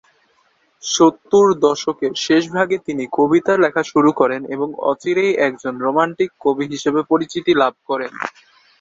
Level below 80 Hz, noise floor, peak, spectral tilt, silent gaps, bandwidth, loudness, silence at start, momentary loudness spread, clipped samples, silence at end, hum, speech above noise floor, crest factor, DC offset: -60 dBFS; -60 dBFS; -2 dBFS; -4.5 dB/octave; none; 7.8 kHz; -17 LUFS; 0.85 s; 8 LU; under 0.1%; 0.5 s; none; 43 dB; 16 dB; under 0.1%